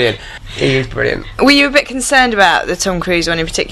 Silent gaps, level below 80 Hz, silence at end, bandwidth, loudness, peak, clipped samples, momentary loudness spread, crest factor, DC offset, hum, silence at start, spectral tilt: none; -32 dBFS; 0 s; 15 kHz; -12 LUFS; 0 dBFS; 0.2%; 9 LU; 14 dB; under 0.1%; none; 0 s; -3.5 dB/octave